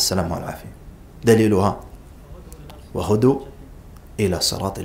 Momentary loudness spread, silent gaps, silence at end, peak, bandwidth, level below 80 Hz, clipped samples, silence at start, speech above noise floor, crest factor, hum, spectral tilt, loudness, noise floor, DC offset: 25 LU; none; 0 s; -2 dBFS; 16 kHz; -42 dBFS; under 0.1%; 0 s; 22 dB; 20 dB; none; -5 dB/octave; -20 LUFS; -41 dBFS; under 0.1%